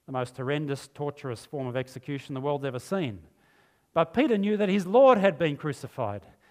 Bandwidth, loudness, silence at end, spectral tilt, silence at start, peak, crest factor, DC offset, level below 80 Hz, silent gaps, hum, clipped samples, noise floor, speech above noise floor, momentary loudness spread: 14.5 kHz; -27 LUFS; 0.3 s; -7 dB/octave; 0.1 s; -6 dBFS; 20 dB; under 0.1%; -66 dBFS; none; none; under 0.1%; -64 dBFS; 38 dB; 16 LU